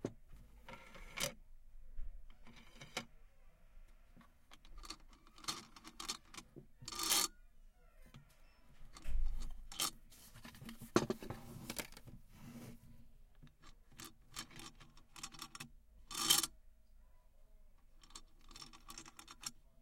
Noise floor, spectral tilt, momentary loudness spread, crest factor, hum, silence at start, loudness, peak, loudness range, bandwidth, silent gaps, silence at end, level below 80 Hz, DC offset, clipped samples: -63 dBFS; -2 dB/octave; 26 LU; 32 dB; none; 0 s; -42 LUFS; -14 dBFS; 15 LU; 16.5 kHz; none; 0.25 s; -52 dBFS; under 0.1%; under 0.1%